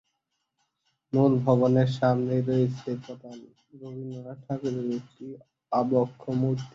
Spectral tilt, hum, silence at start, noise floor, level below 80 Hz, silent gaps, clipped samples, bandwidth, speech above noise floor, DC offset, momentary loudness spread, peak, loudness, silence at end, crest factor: -9 dB/octave; none; 1.15 s; -80 dBFS; -64 dBFS; none; under 0.1%; 7.4 kHz; 53 dB; under 0.1%; 21 LU; -8 dBFS; -26 LUFS; 0.05 s; 20 dB